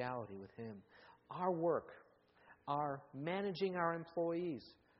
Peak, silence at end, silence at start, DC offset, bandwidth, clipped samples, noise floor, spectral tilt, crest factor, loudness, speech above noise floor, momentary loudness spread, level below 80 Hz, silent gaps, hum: -22 dBFS; 0.3 s; 0 s; under 0.1%; 5.6 kHz; under 0.1%; -68 dBFS; -5 dB/octave; 20 dB; -41 LUFS; 27 dB; 14 LU; -80 dBFS; none; none